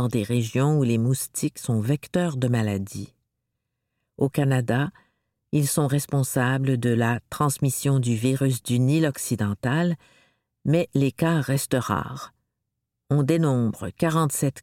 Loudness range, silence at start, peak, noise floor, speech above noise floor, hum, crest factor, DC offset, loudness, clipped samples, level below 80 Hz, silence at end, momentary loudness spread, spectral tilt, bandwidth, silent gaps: 4 LU; 0 s; -8 dBFS; -81 dBFS; 58 dB; none; 16 dB; under 0.1%; -24 LUFS; under 0.1%; -58 dBFS; 0 s; 6 LU; -6 dB/octave; 16.5 kHz; none